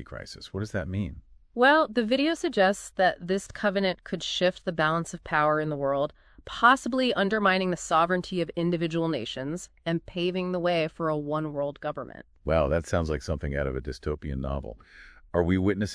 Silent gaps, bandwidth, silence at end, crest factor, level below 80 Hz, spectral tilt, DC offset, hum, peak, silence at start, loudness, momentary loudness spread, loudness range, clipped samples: none; 11 kHz; 0 s; 22 dB; -44 dBFS; -5.5 dB/octave; under 0.1%; none; -6 dBFS; 0 s; -27 LUFS; 11 LU; 5 LU; under 0.1%